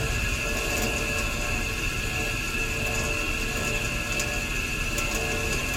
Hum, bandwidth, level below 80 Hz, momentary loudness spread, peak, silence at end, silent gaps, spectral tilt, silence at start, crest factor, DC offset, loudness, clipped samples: none; 16.5 kHz; -34 dBFS; 2 LU; -14 dBFS; 0 s; none; -3 dB/octave; 0 s; 14 dB; under 0.1%; -26 LUFS; under 0.1%